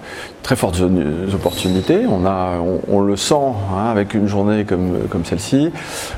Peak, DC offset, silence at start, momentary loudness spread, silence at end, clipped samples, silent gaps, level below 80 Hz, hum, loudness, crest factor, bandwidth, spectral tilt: 0 dBFS; under 0.1%; 0 s; 5 LU; 0 s; under 0.1%; none; -40 dBFS; none; -17 LUFS; 16 dB; 16.5 kHz; -6 dB/octave